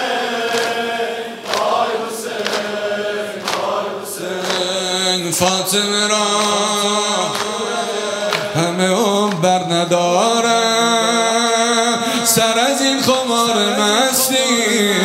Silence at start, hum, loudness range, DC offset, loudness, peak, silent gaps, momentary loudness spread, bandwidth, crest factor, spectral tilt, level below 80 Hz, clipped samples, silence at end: 0 s; none; 6 LU; under 0.1%; -16 LUFS; 0 dBFS; none; 8 LU; 16 kHz; 16 dB; -2.5 dB/octave; -62 dBFS; under 0.1%; 0 s